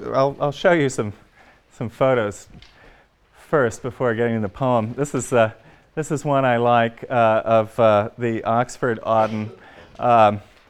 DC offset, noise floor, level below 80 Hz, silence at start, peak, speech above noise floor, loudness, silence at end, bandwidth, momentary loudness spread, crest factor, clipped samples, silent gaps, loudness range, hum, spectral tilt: under 0.1%; -53 dBFS; -54 dBFS; 0 s; -4 dBFS; 34 dB; -20 LUFS; 0.3 s; 13 kHz; 11 LU; 18 dB; under 0.1%; none; 5 LU; none; -6 dB/octave